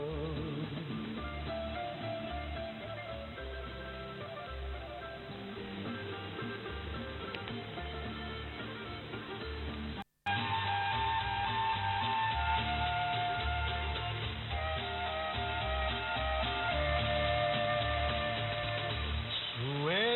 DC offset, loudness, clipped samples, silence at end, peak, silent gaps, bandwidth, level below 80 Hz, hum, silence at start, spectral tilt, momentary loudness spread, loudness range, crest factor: under 0.1%; -36 LUFS; under 0.1%; 0 s; -20 dBFS; none; 4.4 kHz; -46 dBFS; none; 0 s; -7.5 dB/octave; 11 LU; 9 LU; 16 dB